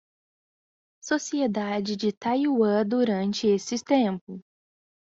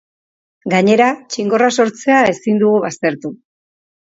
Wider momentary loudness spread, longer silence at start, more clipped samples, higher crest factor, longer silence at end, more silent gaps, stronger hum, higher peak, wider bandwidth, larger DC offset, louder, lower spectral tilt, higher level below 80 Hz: about the same, 9 LU vs 9 LU; first, 1.05 s vs 0.65 s; neither; about the same, 16 dB vs 16 dB; about the same, 0.65 s vs 0.7 s; first, 2.17-2.21 s, 4.21-4.27 s vs none; neither; second, -10 dBFS vs 0 dBFS; about the same, 7.8 kHz vs 7.8 kHz; neither; second, -25 LUFS vs -14 LUFS; about the same, -5 dB/octave vs -5 dB/octave; second, -70 dBFS vs -60 dBFS